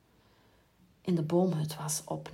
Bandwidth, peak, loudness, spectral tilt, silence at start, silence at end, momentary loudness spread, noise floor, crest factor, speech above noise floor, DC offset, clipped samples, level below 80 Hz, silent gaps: 16 kHz; -16 dBFS; -32 LUFS; -6 dB/octave; 1.05 s; 0 s; 6 LU; -65 dBFS; 16 dB; 34 dB; under 0.1%; under 0.1%; -72 dBFS; none